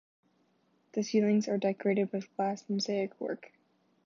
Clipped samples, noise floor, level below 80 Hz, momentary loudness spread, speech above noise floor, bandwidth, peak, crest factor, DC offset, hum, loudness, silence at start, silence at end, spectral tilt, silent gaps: under 0.1%; -71 dBFS; -84 dBFS; 11 LU; 41 dB; 7.4 kHz; -16 dBFS; 16 dB; under 0.1%; none; -32 LUFS; 0.95 s; 0.6 s; -6 dB/octave; none